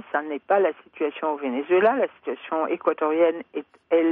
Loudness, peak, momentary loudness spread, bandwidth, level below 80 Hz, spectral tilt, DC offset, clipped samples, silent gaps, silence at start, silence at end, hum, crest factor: -24 LUFS; -8 dBFS; 11 LU; 3.9 kHz; -74 dBFS; -8 dB/octave; under 0.1%; under 0.1%; none; 0.1 s; 0 s; none; 16 dB